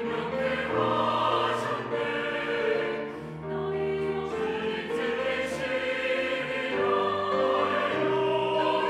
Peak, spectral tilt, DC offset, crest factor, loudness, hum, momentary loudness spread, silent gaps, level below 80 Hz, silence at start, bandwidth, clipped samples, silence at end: -12 dBFS; -5.5 dB/octave; under 0.1%; 14 dB; -28 LUFS; none; 5 LU; none; -62 dBFS; 0 s; 12.5 kHz; under 0.1%; 0 s